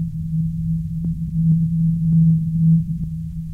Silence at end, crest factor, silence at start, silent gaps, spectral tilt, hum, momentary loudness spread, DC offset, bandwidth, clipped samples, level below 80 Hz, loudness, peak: 0 s; 10 dB; 0 s; none; -12 dB/octave; none; 9 LU; under 0.1%; 0.5 kHz; under 0.1%; -34 dBFS; -19 LUFS; -8 dBFS